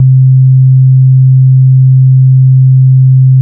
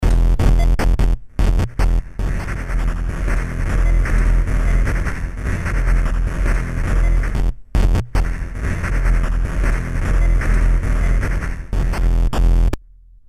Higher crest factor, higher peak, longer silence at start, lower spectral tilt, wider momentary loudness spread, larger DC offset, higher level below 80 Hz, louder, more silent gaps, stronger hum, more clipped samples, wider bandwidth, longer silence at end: second, 4 dB vs 14 dB; about the same, 0 dBFS vs -2 dBFS; about the same, 0 s vs 0 s; first, -21 dB/octave vs -6.5 dB/octave; second, 0 LU vs 6 LU; neither; second, -62 dBFS vs -16 dBFS; first, -5 LUFS vs -21 LUFS; neither; neither; neither; second, 0.2 kHz vs 11 kHz; second, 0 s vs 0.5 s